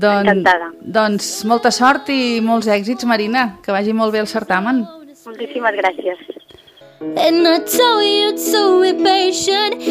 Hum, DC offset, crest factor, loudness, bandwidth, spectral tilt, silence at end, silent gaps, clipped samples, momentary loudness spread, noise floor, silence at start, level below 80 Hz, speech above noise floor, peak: none; under 0.1%; 14 dB; -15 LUFS; 15.5 kHz; -3.5 dB/octave; 0 s; none; under 0.1%; 12 LU; -44 dBFS; 0 s; -58 dBFS; 28 dB; -2 dBFS